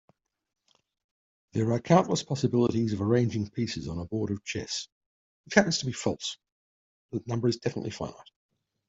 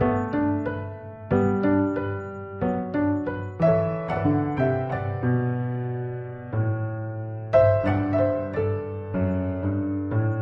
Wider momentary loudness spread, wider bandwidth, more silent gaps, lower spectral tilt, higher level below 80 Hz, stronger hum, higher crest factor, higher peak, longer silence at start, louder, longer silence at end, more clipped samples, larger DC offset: first, 13 LU vs 10 LU; first, 8 kHz vs 5.6 kHz; first, 4.92-5.44 s, 6.52-7.09 s vs none; second, -5.5 dB/octave vs -10.5 dB/octave; second, -62 dBFS vs -50 dBFS; neither; first, 26 dB vs 18 dB; about the same, -4 dBFS vs -6 dBFS; first, 1.55 s vs 0 s; second, -29 LUFS vs -25 LUFS; first, 0.65 s vs 0 s; neither; neither